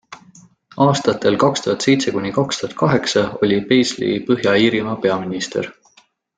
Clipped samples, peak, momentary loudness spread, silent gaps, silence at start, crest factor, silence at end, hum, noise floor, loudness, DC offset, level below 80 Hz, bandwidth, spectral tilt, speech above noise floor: under 0.1%; -2 dBFS; 7 LU; none; 0.1 s; 16 dB; 0.65 s; none; -55 dBFS; -17 LUFS; under 0.1%; -54 dBFS; 9.4 kHz; -5 dB/octave; 38 dB